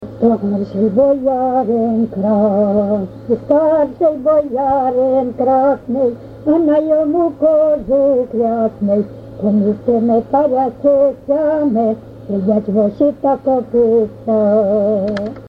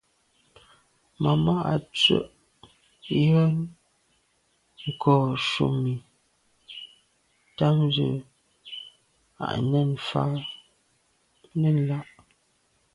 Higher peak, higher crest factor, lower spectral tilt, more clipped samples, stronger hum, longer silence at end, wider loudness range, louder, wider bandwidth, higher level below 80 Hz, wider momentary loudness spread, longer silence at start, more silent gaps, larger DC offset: first, -2 dBFS vs -6 dBFS; second, 14 dB vs 20 dB; first, -10.5 dB/octave vs -7 dB/octave; neither; neither; second, 0 s vs 0.9 s; second, 1 LU vs 5 LU; first, -15 LUFS vs -25 LUFS; second, 5.4 kHz vs 11 kHz; first, -46 dBFS vs -58 dBFS; second, 5 LU vs 20 LU; second, 0 s vs 1.2 s; neither; neither